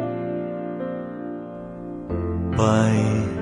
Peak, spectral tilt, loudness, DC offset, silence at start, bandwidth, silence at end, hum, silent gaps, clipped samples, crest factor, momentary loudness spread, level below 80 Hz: -4 dBFS; -7 dB/octave; -24 LUFS; under 0.1%; 0 s; 10 kHz; 0 s; none; none; under 0.1%; 20 dB; 15 LU; -48 dBFS